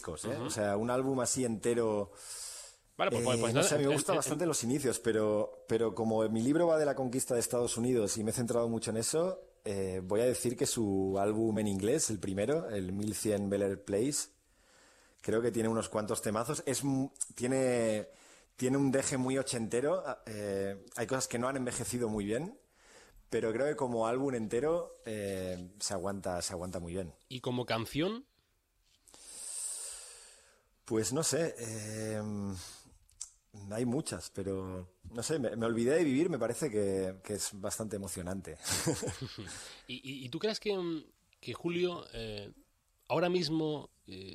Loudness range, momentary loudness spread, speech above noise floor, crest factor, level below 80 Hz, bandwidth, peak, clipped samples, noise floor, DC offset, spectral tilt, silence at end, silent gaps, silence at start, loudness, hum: 7 LU; 12 LU; 41 dB; 18 dB; -64 dBFS; 15 kHz; -16 dBFS; under 0.1%; -75 dBFS; under 0.1%; -4.5 dB/octave; 0 s; none; 0 s; -34 LUFS; none